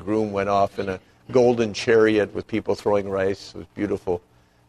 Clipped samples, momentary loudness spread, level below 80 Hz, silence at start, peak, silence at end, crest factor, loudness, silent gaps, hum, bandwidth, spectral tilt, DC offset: under 0.1%; 12 LU; -54 dBFS; 0 s; -4 dBFS; 0.5 s; 18 dB; -22 LUFS; none; none; 11.5 kHz; -6 dB/octave; under 0.1%